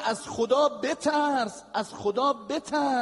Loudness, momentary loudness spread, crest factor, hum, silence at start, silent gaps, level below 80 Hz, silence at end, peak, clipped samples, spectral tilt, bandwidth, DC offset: -27 LUFS; 7 LU; 16 dB; none; 0 s; none; -68 dBFS; 0 s; -10 dBFS; under 0.1%; -3.5 dB/octave; 11.5 kHz; under 0.1%